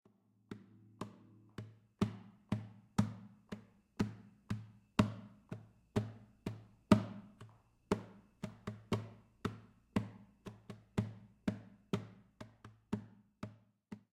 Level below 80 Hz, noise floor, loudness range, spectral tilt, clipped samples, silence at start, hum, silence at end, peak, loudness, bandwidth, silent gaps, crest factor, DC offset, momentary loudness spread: -64 dBFS; -62 dBFS; 7 LU; -7 dB/octave; under 0.1%; 0.5 s; none; 0.15 s; -12 dBFS; -42 LUFS; 14 kHz; none; 30 dB; under 0.1%; 20 LU